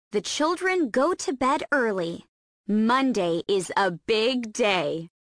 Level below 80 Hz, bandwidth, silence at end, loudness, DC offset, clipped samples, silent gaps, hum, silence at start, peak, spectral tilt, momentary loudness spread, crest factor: -62 dBFS; 10.5 kHz; 0.15 s; -24 LUFS; under 0.1%; under 0.1%; 2.29-2.64 s; none; 0.15 s; -10 dBFS; -4 dB/octave; 6 LU; 16 dB